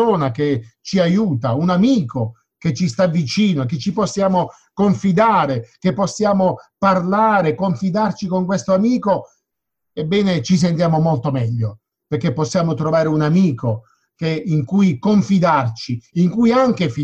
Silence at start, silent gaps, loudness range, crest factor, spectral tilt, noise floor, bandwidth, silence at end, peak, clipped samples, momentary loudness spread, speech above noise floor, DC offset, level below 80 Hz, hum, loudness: 0 s; none; 2 LU; 16 dB; -7 dB/octave; -79 dBFS; 8.4 kHz; 0 s; -2 dBFS; under 0.1%; 9 LU; 63 dB; under 0.1%; -52 dBFS; none; -18 LUFS